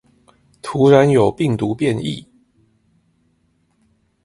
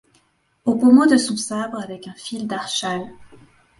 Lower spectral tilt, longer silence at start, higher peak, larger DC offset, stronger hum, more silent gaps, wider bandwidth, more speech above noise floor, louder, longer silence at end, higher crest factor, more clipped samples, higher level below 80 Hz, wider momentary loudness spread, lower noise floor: first, -7 dB/octave vs -4 dB/octave; about the same, 0.65 s vs 0.65 s; about the same, 0 dBFS vs -2 dBFS; neither; neither; neither; about the same, 11.5 kHz vs 11.5 kHz; first, 48 dB vs 44 dB; first, -16 LUFS vs -19 LUFS; first, 2.05 s vs 0.55 s; about the same, 20 dB vs 18 dB; neither; first, -52 dBFS vs -62 dBFS; second, 16 LU vs 19 LU; about the same, -62 dBFS vs -62 dBFS